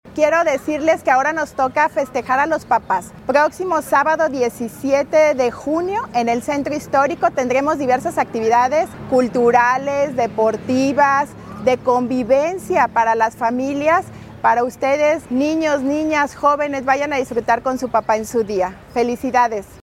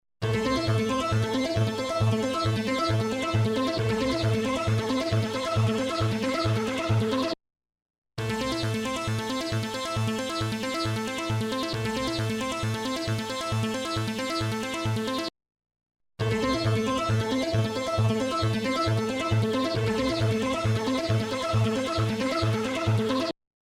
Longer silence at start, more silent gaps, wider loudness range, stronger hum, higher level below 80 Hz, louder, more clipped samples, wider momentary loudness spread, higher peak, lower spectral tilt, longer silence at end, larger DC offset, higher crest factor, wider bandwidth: second, 0.05 s vs 0.2 s; second, none vs 7.82-8.02 s; about the same, 2 LU vs 3 LU; neither; about the same, -50 dBFS vs -48 dBFS; first, -18 LUFS vs -27 LUFS; neither; about the same, 6 LU vs 4 LU; first, -2 dBFS vs -14 dBFS; about the same, -5 dB/octave vs -5.5 dB/octave; second, 0.05 s vs 0.35 s; neither; about the same, 16 dB vs 14 dB; about the same, 16 kHz vs 15.5 kHz